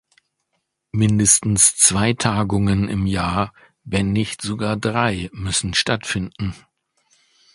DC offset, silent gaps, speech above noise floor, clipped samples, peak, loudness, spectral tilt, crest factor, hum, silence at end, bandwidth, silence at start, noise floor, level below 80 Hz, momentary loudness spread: under 0.1%; none; 54 dB; under 0.1%; 0 dBFS; -18 LUFS; -3.5 dB/octave; 20 dB; none; 1 s; 11.5 kHz; 0.95 s; -74 dBFS; -40 dBFS; 12 LU